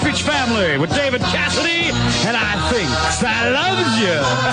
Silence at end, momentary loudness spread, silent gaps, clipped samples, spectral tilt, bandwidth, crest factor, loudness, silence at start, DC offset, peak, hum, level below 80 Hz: 0 s; 2 LU; none; under 0.1%; -4 dB/octave; 10 kHz; 12 dB; -16 LUFS; 0 s; under 0.1%; -6 dBFS; none; -36 dBFS